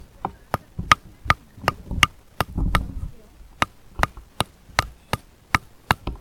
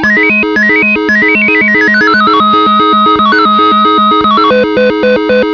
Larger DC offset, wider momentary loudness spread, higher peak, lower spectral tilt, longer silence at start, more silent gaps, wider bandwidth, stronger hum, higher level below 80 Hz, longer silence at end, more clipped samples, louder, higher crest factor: second, under 0.1% vs 0.3%; first, 11 LU vs 3 LU; about the same, 0 dBFS vs 0 dBFS; second, -3.5 dB/octave vs -5.5 dB/octave; first, 0.2 s vs 0 s; neither; first, 18 kHz vs 5.4 kHz; neither; first, -36 dBFS vs -42 dBFS; about the same, 0 s vs 0 s; second, under 0.1% vs 0.5%; second, -25 LUFS vs -6 LUFS; first, 26 dB vs 8 dB